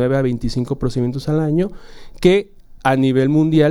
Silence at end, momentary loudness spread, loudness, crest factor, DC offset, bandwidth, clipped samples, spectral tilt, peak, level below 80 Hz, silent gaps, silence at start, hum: 0 s; 7 LU; -18 LUFS; 14 dB; under 0.1%; 12.5 kHz; under 0.1%; -7.5 dB/octave; -2 dBFS; -36 dBFS; none; 0 s; none